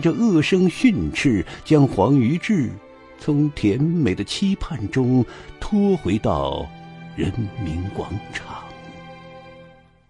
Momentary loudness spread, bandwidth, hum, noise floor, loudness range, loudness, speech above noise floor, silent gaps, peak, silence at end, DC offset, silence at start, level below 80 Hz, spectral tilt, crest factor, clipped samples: 19 LU; 11.5 kHz; none; -48 dBFS; 9 LU; -21 LUFS; 28 dB; none; -2 dBFS; 0.45 s; under 0.1%; 0 s; -42 dBFS; -7 dB/octave; 18 dB; under 0.1%